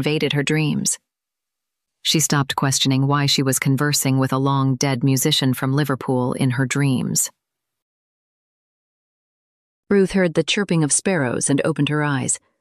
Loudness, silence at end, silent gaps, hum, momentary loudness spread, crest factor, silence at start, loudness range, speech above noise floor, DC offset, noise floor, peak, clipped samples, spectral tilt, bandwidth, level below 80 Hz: -19 LUFS; 0.25 s; 7.82-9.83 s; none; 4 LU; 14 dB; 0 s; 7 LU; 66 dB; under 0.1%; -85 dBFS; -6 dBFS; under 0.1%; -4 dB/octave; 15 kHz; -56 dBFS